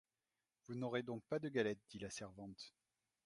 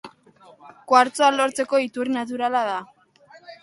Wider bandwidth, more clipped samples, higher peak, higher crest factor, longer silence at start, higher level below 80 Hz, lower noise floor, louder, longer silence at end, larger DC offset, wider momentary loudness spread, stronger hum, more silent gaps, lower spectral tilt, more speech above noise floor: about the same, 11.5 kHz vs 11.5 kHz; neither; second, -26 dBFS vs -2 dBFS; about the same, 22 dB vs 22 dB; first, 0.7 s vs 0.05 s; about the same, -78 dBFS vs -74 dBFS; first, under -90 dBFS vs -52 dBFS; second, -45 LUFS vs -21 LUFS; first, 0.55 s vs 0.1 s; neither; first, 13 LU vs 8 LU; neither; neither; first, -5 dB/octave vs -2.5 dB/octave; first, over 45 dB vs 31 dB